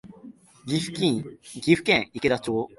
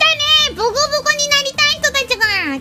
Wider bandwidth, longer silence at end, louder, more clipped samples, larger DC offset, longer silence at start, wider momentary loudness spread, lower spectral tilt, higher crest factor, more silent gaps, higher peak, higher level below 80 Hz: second, 11.5 kHz vs 16.5 kHz; about the same, 0.1 s vs 0 s; second, -24 LUFS vs -13 LUFS; neither; neither; about the same, 0.05 s vs 0 s; first, 11 LU vs 4 LU; first, -5 dB/octave vs -0.5 dB/octave; about the same, 20 dB vs 16 dB; neither; second, -4 dBFS vs 0 dBFS; second, -58 dBFS vs -44 dBFS